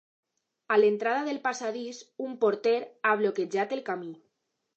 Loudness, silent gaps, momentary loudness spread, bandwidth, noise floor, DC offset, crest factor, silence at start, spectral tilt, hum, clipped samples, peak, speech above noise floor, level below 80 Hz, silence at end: -28 LUFS; none; 14 LU; 8.2 kHz; -79 dBFS; under 0.1%; 18 dB; 0.7 s; -4.5 dB/octave; none; under 0.1%; -10 dBFS; 51 dB; -88 dBFS; 0.6 s